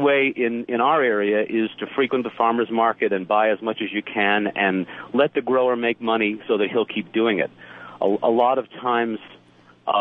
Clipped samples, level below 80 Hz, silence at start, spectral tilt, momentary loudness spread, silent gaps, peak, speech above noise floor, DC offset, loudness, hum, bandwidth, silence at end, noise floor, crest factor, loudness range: under 0.1%; -72 dBFS; 0 s; -8 dB/octave; 7 LU; none; -4 dBFS; 31 dB; under 0.1%; -21 LUFS; none; 4 kHz; 0 s; -52 dBFS; 16 dB; 2 LU